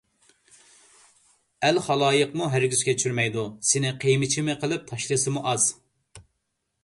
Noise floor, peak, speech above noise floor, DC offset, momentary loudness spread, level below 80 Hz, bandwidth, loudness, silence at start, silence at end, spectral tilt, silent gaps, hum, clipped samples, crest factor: -78 dBFS; -8 dBFS; 54 dB; under 0.1%; 5 LU; -64 dBFS; 11.5 kHz; -24 LUFS; 1.6 s; 0.65 s; -3.5 dB/octave; none; none; under 0.1%; 18 dB